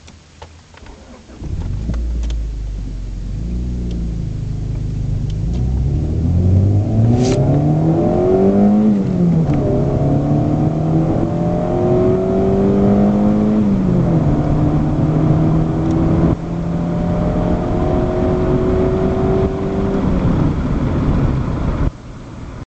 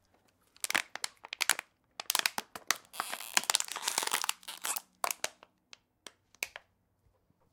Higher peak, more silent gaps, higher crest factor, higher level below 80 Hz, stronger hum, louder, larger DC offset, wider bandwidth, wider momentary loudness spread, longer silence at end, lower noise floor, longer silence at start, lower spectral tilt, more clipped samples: about the same, -2 dBFS vs -2 dBFS; neither; second, 14 dB vs 36 dB; first, -24 dBFS vs -80 dBFS; neither; first, -16 LUFS vs -33 LUFS; neither; second, 8.2 kHz vs 18 kHz; second, 10 LU vs 17 LU; second, 0.1 s vs 0.95 s; second, -39 dBFS vs -73 dBFS; second, 0.05 s vs 0.65 s; first, -9.5 dB/octave vs 2 dB/octave; neither